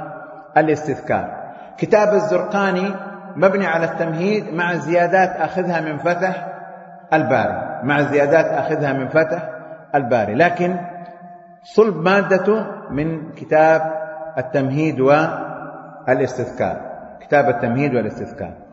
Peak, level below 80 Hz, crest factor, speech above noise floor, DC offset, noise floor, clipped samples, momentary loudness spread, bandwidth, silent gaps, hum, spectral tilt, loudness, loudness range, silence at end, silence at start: 0 dBFS; -56 dBFS; 18 dB; 23 dB; under 0.1%; -40 dBFS; under 0.1%; 17 LU; 8 kHz; none; none; -7 dB/octave; -18 LUFS; 2 LU; 0.05 s; 0 s